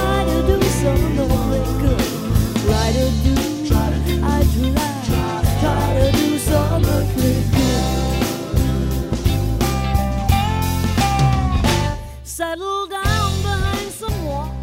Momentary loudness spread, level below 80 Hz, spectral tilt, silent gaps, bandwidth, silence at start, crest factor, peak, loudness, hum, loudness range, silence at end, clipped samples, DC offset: 6 LU; -24 dBFS; -5.5 dB/octave; none; 16.5 kHz; 0 s; 16 dB; -2 dBFS; -19 LUFS; none; 2 LU; 0 s; under 0.1%; under 0.1%